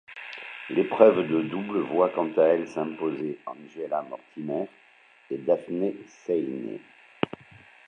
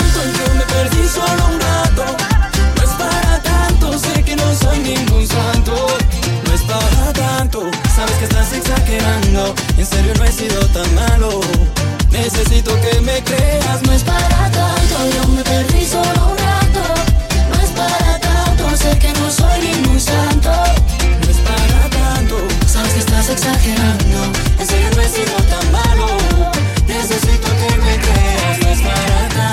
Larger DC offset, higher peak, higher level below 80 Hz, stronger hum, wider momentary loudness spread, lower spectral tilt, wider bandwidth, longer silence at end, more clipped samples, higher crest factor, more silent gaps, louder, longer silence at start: neither; second, -4 dBFS vs 0 dBFS; second, -72 dBFS vs -14 dBFS; neither; first, 18 LU vs 2 LU; first, -7.5 dB/octave vs -4.5 dB/octave; second, 6.8 kHz vs 16.5 kHz; first, 0.6 s vs 0 s; neither; first, 24 dB vs 12 dB; neither; second, -26 LUFS vs -14 LUFS; about the same, 0.1 s vs 0 s